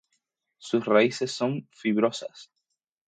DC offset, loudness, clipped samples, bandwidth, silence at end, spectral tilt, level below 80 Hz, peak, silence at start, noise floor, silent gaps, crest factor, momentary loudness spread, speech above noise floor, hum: under 0.1%; -26 LUFS; under 0.1%; 9.4 kHz; 0.65 s; -5 dB/octave; -76 dBFS; -8 dBFS; 0.6 s; -81 dBFS; none; 20 dB; 16 LU; 56 dB; none